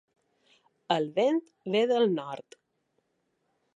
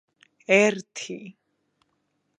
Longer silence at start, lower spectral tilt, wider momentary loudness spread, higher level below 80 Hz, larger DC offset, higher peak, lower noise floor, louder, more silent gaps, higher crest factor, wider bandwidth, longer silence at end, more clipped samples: first, 0.9 s vs 0.5 s; first, -6 dB/octave vs -4 dB/octave; second, 11 LU vs 20 LU; about the same, -84 dBFS vs -80 dBFS; neither; second, -12 dBFS vs -4 dBFS; about the same, -77 dBFS vs -74 dBFS; second, -28 LUFS vs -22 LUFS; neither; about the same, 20 dB vs 24 dB; about the same, 9.6 kHz vs 9.6 kHz; first, 1.35 s vs 1.1 s; neither